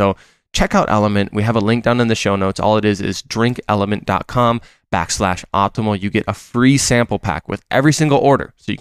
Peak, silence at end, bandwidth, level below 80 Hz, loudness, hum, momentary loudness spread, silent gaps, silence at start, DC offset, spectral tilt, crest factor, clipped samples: -2 dBFS; 0.05 s; 15 kHz; -36 dBFS; -16 LUFS; none; 8 LU; none; 0 s; under 0.1%; -5 dB/octave; 14 dB; under 0.1%